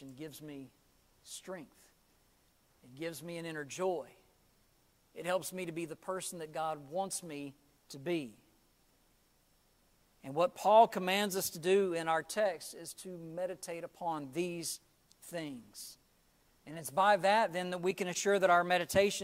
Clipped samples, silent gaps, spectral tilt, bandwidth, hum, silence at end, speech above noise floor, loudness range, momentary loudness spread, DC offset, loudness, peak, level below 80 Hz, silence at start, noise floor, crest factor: under 0.1%; none; -3.5 dB/octave; 16 kHz; none; 0 s; 37 dB; 12 LU; 20 LU; under 0.1%; -34 LUFS; -14 dBFS; -72 dBFS; 0 s; -71 dBFS; 22 dB